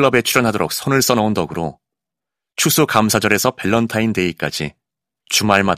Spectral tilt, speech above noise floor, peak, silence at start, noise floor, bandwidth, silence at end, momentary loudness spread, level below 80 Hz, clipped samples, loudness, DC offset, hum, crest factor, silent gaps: -4 dB/octave; 69 dB; 0 dBFS; 0 s; -85 dBFS; 16 kHz; 0 s; 11 LU; -50 dBFS; 0.1%; -16 LUFS; under 0.1%; none; 18 dB; none